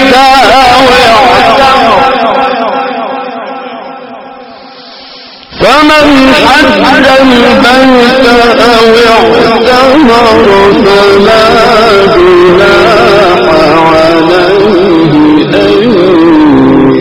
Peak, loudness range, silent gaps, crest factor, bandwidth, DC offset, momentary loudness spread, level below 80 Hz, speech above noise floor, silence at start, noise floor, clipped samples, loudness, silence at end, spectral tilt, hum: 0 dBFS; 7 LU; none; 4 dB; over 20 kHz; under 0.1%; 8 LU; -28 dBFS; 25 dB; 0 s; -27 dBFS; 20%; -3 LUFS; 0 s; -5 dB/octave; none